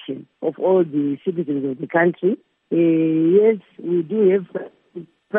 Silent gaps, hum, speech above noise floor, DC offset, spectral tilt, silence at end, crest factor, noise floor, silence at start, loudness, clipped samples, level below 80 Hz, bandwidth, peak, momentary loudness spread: none; none; 20 dB; under 0.1%; -11.5 dB/octave; 0 s; 14 dB; -39 dBFS; 0 s; -19 LUFS; under 0.1%; -76 dBFS; 3.7 kHz; -4 dBFS; 16 LU